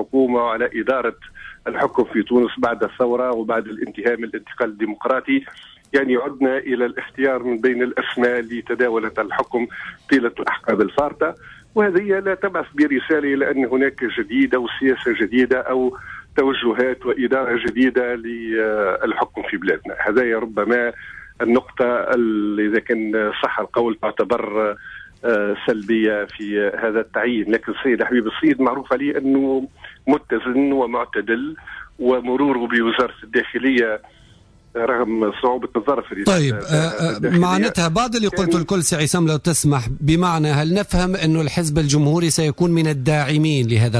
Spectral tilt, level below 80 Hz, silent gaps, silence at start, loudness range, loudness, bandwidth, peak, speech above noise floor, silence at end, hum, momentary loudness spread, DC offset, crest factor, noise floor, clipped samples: -5.5 dB/octave; -44 dBFS; none; 0 s; 3 LU; -19 LUFS; 11 kHz; -6 dBFS; 31 dB; 0 s; none; 6 LU; under 0.1%; 14 dB; -49 dBFS; under 0.1%